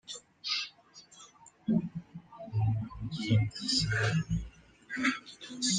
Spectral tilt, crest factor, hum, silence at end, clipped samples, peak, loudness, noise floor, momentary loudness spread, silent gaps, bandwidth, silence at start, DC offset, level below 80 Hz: -4 dB/octave; 18 dB; none; 0 s; under 0.1%; -14 dBFS; -32 LUFS; -57 dBFS; 21 LU; none; 10 kHz; 0.1 s; under 0.1%; -52 dBFS